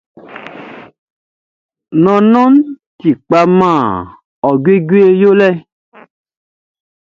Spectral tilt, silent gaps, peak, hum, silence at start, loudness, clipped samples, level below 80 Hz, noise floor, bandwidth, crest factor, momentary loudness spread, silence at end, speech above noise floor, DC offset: -8.5 dB/octave; 0.98-1.69 s, 2.86-2.99 s, 4.25-4.42 s; 0 dBFS; none; 0.3 s; -10 LUFS; under 0.1%; -52 dBFS; -32 dBFS; 7.2 kHz; 12 dB; 22 LU; 1.45 s; 23 dB; under 0.1%